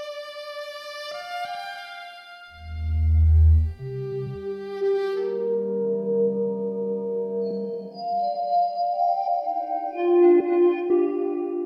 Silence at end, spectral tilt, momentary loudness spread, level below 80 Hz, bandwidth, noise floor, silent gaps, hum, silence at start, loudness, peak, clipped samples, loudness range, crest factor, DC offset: 0 s; -9 dB/octave; 16 LU; -30 dBFS; 6.2 kHz; -43 dBFS; none; none; 0 s; -24 LUFS; -8 dBFS; under 0.1%; 4 LU; 14 dB; under 0.1%